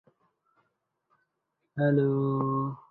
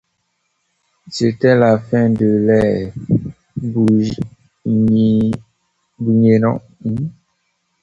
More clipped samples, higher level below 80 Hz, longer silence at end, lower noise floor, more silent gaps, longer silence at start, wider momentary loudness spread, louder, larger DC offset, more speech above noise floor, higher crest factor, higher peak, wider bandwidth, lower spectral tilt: neither; second, -68 dBFS vs -46 dBFS; second, 0.15 s vs 0.7 s; first, -81 dBFS vs -68 dBFS; neither; first, 1.75 s vs 1.05 s; second, 7 LU vs 14 LU; second, -27 LUFS vs -16 LUFS; neither; about the same, 54 dB vs 54 dB; about the same, 16 dB vs 16 dB; second, -14 dBFS vs 0 dBFS; second, 4.2 kHz vs 7.8 kHz; first, -12 dB/octave vs -8 dB/octave